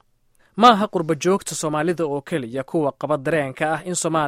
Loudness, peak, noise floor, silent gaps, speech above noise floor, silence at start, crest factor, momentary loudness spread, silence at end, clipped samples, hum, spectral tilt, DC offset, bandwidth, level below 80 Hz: -21 LUFS; 0 dBFS; -60 dBFS; none; 39 dB; 0.55 s; 20 dB; 11 LU; 0 s; under 0.1%; none; -4.5 dB/octave; under 0.1%; 16 kHz; -60 dBFS